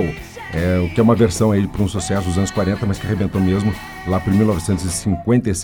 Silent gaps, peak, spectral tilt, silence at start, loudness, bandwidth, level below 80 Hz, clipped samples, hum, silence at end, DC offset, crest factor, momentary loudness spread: none; -4 dBFS; -6.5 dB/octave; 0 s; -18 LUFS; 18.5 kHz; -36 dBFS; under 0.1%; none; 0 s; under 0.1%; 14 dB; 7 LU